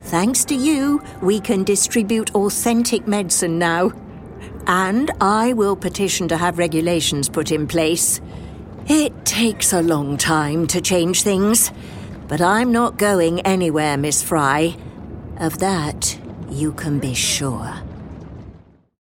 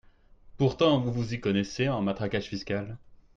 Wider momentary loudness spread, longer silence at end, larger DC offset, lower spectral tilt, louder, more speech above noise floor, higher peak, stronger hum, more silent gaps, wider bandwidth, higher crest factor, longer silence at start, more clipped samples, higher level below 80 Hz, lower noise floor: first, 17 LU vs 9 LU; first, 0.5 s vs 0.2 s; neither; second, -3.5 dB/octave vs -6.5 dB/octave; first, -18 LUFS vs -28 LUFS; about the same, 26 dB vs 27 dB; first, -2 dBFS vs -10 dBFS; neither; neither; first, 16.5 kHz vs 7.6 kHz; about the same, 16 dB vs 18 dB; second, 0 s vs 0.45 s; neither; first, -42 dBFS vs -54 dBFS; second, -44 dBFS vs -55 dBFS